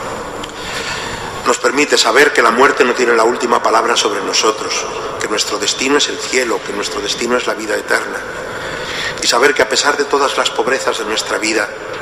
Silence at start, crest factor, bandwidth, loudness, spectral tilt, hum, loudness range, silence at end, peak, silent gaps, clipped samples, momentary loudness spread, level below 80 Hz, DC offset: 0 s; 16 dB; 15.5 kHz; -14 LUFS; -1.5 dB/octave; none; 5 LU; 0 s; 0 dBFS; none; under 0.1%; 12 LU; -46 dBFS; under 0.1%